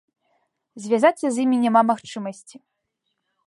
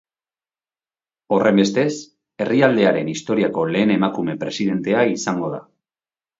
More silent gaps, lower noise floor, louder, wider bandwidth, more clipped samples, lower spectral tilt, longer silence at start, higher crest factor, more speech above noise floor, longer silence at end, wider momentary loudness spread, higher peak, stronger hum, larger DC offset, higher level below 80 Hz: neither; second, -77 dBFS vs under -90 dBFS; about the same, -20 LUFS vs -19 LUFS; first, 11.5 kHz vs 7.8 kHz; neither; about the same, -5 dB/octave vs -5.5 dB/octave; second, 0.75 s vs 1.3 s; about the same, 18 dB vs 20 dB; second, 56 dB vs over 72 dB; first, 1.15 s vs 0.8 s; first, 15 LU vs 9 LU; second, -4 dBFS vs 0 dBFS; neither; neither; second, -76 dBFS vs -62 dBFS